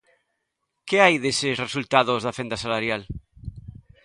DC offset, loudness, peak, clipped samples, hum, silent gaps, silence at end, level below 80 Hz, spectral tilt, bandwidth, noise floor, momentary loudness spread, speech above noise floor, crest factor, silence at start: under 0.1%; -22 LUFS; 0 dBFS; under 0.1%; none; none; 0.35 s; -50 dBFS; -4 dB/octave; 11.5 kHz; -78 dBFS; 22 LU; 56 dB; 24 dB; 0.85 s